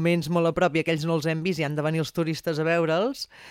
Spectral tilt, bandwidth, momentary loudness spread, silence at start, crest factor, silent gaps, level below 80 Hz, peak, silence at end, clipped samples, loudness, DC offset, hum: -6 dB/octave; 16 kHz; 5 LU; 0 s; 14 dB; none; -58 dBFS; -10 dBFS; 0 s; under 0.1%; -25 LUFS; under 0.1%; none